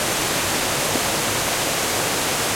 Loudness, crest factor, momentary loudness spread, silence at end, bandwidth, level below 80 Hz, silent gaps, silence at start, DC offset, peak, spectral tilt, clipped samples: -20 LUFS; 14 dB; 0 LU; 0 s; 16.5 kHz; -46 dBFS; none; 0 s; under 0.1%; -8 dBFS; -1.5 dB/octave; under 0.1%